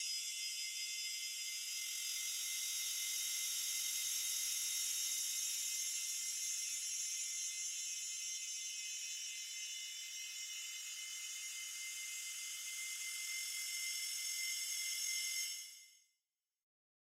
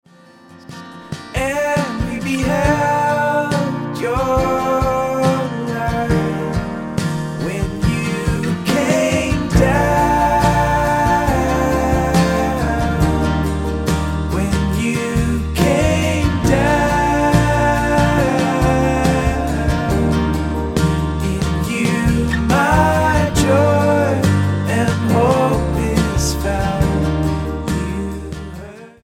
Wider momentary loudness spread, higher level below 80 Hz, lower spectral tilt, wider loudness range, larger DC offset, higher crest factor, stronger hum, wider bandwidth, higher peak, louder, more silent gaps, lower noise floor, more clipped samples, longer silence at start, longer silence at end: about the same, 7 LU vs 7 LU; second, under -90 dBFS vs -26 dBFS; second, 6.5 dB/octave vs -6 dB/octave; about the same, 6 LU vs 4 LU; neither; about the same, 16 dB vs 16 dB; neither; about the same, 16 kHz vs 17 kHz; second, -28 dBFS vs 0 dBFS; second, -40 LUFS vs -17 LUFS; neither; first, under -90 dBFS vs -44 dBFS; neither; second, 0 s vs 0.5 s; first, 1.2 s vs 0.15 s